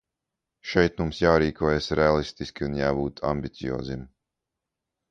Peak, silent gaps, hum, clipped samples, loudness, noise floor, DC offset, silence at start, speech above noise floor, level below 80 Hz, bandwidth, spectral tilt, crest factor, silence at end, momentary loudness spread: -4 dBFS; none; none; under 0.1%; -25 LUFS; -85 dBFS; under 0.1%; 0.65 s; 61 dB; -42 dBFS; 9.2 kHz; -6.5 dB/octave; 22 dB; 1.05 s; 12 LU